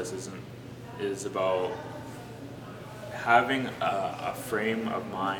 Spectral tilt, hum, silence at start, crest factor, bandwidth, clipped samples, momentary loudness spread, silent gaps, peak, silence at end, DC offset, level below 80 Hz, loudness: -4.5 dB/octave; none; 0 s; 24 dB; 19 kHz; under 0.1%; 19 LU; none; -6 dBFS; 0 s; under 0.1%; -62 dBFS; -30 LUFS